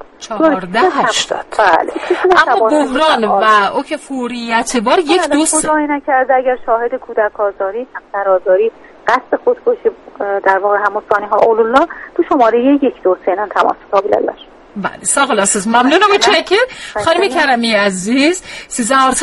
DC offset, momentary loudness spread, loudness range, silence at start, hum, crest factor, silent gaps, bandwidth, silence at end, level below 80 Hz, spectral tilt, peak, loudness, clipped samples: under 0.1%; 9 LU; 4 LU; 0.2 s; none; 14 dB; none; 11.5 kHz; 0 s; -48 dBFS; -2.5 dB/octave; 0 dBFS; -13 LUFS; under 0.1%